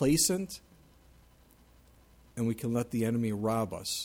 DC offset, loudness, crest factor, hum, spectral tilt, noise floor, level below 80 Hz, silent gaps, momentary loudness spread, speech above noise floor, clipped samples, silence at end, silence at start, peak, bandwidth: under 0.1%; -31 LUFS; 18 dB; none; -4.5 dB/octave; -60 dBFS; -58 dBFS; none; 14 LU; 30 dB; under 0.1%; 0 s; 0 s; -14 dBFS; 17 kHz